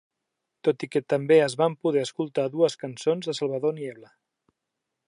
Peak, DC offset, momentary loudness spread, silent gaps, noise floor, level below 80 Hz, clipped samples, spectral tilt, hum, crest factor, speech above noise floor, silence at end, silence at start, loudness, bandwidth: -8 dBFS; under 0.1%; 9 LU; none; -83 dBFS; -78 dBFS; under 0.1%; -5.5 dB/octave; none; 18 dB; 59 dB; 1.05 s; 0.65 s; -25 LUFS; 11 kHz